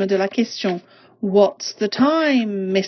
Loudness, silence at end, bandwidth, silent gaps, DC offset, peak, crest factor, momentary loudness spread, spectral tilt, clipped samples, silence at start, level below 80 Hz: -19 LUFS; 0 s; 6.6 kHz; none; under 0.1%; -2 dBFS; 16 dB; 8 LU; -5.5 dB/octave; under 0.1%; 0 s; -68 dBFS